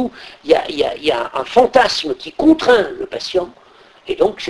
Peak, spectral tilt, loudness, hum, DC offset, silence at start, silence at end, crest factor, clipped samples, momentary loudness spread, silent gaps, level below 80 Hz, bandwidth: 0 dBFS; -4 dB/octave; -16 LUFS; none; under 0.1%; 0 s; 0 s; 16 dB; under 0.1%; 12 LU; none; -46 dBFS; 11 kHz